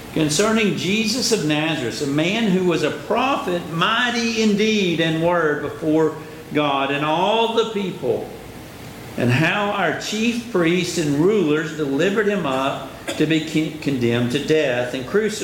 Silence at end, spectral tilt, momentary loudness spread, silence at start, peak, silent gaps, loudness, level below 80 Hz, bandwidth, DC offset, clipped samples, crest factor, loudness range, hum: 0 s; -4.5 dB/octave; 7 LU; 0 s; -6 dBFS; none; -20 LUFS; -52 dBFS; 17 kHz; under 0.1%; under 0.1%; 14 dB; 2 LU; none